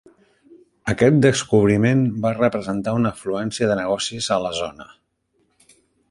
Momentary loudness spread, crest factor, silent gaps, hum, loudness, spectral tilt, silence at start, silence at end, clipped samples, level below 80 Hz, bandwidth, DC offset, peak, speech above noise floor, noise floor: 10 LU; 18 dB; none; none; -20 LUFS; -5.5 dB/octave; 0.85 s; 1.25 s; under 0.1%; -50 dBFS; 11.5 kHz; under 0.1%; -2 dBFS; 48 dB; -67 dBFS